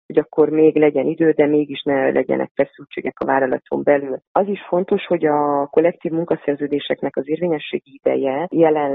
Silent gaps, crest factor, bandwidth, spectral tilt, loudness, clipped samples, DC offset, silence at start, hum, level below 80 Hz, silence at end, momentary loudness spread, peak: 2.51-2.55 s, 4.27-4.35 s; 16 dB; 4 kHz; -10.5 dB/octave; -19 LUFS; under 0.1%; under 0.1%; 0.1 s; none; -62 dBFS; 0 s; 8 LU; -2 dBFS